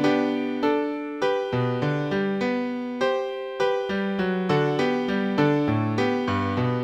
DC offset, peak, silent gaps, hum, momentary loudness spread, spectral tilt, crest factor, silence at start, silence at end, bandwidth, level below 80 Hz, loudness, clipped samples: under 0.1%; -8 dBFS; none; none; 4 LU; -7 dB/octave; 16 dB; 0 s; 0 s; 9.2 kHz; -60 dBFS; -24 LUFS; under 0.1%